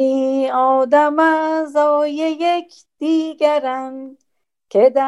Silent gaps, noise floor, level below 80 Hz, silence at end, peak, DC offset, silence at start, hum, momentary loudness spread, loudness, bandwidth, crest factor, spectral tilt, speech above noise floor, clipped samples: none; -54 dBFS; -74 dBFS; 0 s; -2 dBFS; under 0.1%; 0 s; none; 10 LU; -17 LUFS; 11.5 kHz; 14 dB; -4.5 dB/octave; 38 dB; under 0.1%